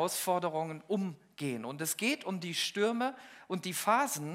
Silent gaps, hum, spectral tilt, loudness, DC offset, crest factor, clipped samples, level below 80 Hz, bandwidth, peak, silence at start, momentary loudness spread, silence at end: none; none; -3.5 dB/octave; -33 LUFS; under 0.1%; 20 dB; under 0.1%; -86 dBFS; 16 kHz; -14 dBFS; 0 s; 9 LU; 0 s